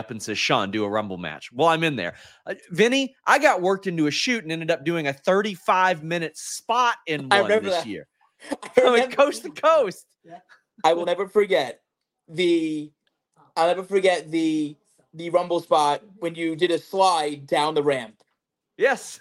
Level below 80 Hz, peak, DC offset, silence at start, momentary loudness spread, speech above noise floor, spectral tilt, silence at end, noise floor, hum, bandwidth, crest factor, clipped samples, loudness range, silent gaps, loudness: -72 dBFS; -2 dBFS; under 0.1%; 0 s; 13 LU; 55 dB; -4 dB/octave; 0.05 s; -78 dBFS; none; 16 kHz; 22 dB; under 0.1%; 3 LU; none; -22 LUFS